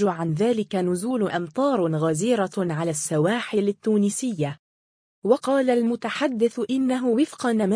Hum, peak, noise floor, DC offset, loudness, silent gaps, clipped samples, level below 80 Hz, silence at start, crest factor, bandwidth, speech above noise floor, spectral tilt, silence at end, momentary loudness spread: none; -6 dBFS; under -90 dBFS; under 0.1%; -23 LUFS; 4.59-5.22 s; under 0.1%; -68 dBFS; 0 s; 16 dB; 10.5 kHz; over 68 dB; -5.5 dB/octave; 0 s; 4 LU